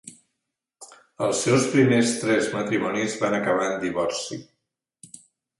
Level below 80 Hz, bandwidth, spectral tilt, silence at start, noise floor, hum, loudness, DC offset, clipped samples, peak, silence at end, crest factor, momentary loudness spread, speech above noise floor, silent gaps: -64 dBFS; 11.5 kHz; -4.5 dB/octave; 0.05 s; -82 dBFS; none; -23 LUFS; under 0.1%; under 0.1%; -6 dBFS; 0.45 s; 18 dB; 9 LU; 59 dB; none